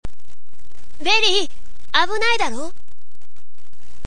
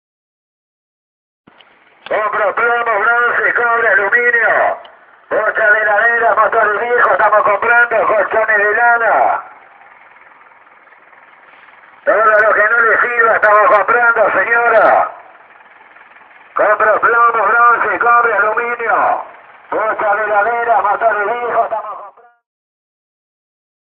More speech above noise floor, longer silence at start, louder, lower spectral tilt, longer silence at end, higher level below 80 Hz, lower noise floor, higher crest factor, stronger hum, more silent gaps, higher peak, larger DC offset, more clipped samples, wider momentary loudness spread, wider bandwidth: first, 40 dB vs 35 dB; second, 0 s vs 2.1 s; second, -19 LUFS vs -12 LUFS; second, -2 dB/octave vs -6 dB/octave; second, 1.35 s vs 1.8 s; first, -42 dBFS vs -60 dBFS; first, -60 dBFS vs -47 dBFS; first, 22 dB vs 14 dB; neither; neither; about the same, 0 dBFS vs 0 dBFS; first, 20% vs under 0.1%; neither; first, 18 LU vs 8 LU; first, 10 kHz vs 4.5 kHz